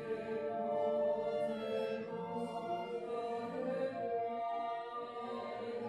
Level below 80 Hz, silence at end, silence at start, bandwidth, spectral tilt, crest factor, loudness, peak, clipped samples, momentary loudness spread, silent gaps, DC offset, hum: -78 dBFS; 0 s; 0 s; 12 kHz; -6.5 dB/octave; 12 dB; -39 LUFS; -26 dBFS; under 0.1%; 7 LU; none; under 0.1%; none